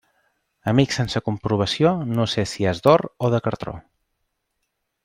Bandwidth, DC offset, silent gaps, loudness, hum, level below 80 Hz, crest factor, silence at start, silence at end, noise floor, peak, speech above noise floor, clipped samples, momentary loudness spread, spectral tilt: 16 kHz; under 0.1%; none; -21 LUFS; none; -52 dBFS; 20 dB; 0.65 s; 1.25 s; -76 dBFS; -2 dBFS; 55 dB; under 0.1%; 12 LU; -6 dB/octave